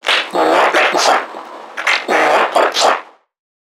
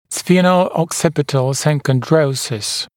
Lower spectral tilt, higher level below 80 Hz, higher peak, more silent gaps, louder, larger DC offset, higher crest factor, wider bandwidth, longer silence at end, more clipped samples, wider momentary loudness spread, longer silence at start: second, -1 dB/octave vs -5 dB/octave; second, -70 dBFS vs -56 dBFS; about the same, 0 dBFS vs 0 dBFS; neither; first, -13 LUFS vs -16 LUFS; neither; about the same, 14 dB vs 16 dB; about the same, 18 kHz vs 17.5 kHz; first, 0.6 s vs 0.1 s; neither; first, 10 LU vs 6 LU; about the same, 0.05 s vs 0.1 s